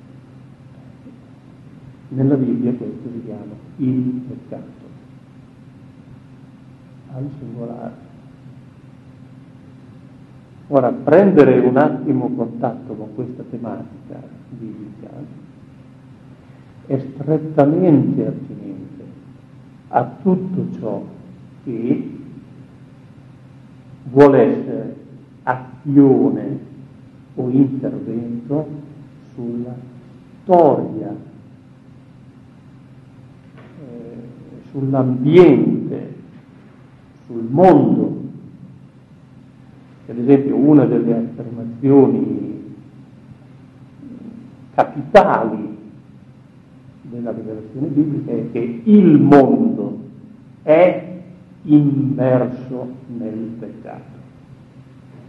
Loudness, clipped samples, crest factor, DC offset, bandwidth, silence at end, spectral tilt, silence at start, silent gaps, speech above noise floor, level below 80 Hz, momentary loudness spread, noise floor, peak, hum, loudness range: -16 LUFS; under 0.1%; 18 dB; under 0.1%; 6 kHz; 1.05 s; -10 dB/octave; 0.15 s; none; 29 dB; -56 dBFS; 25 LU; -44 dBFS; 0 dBFS; none; 18 LU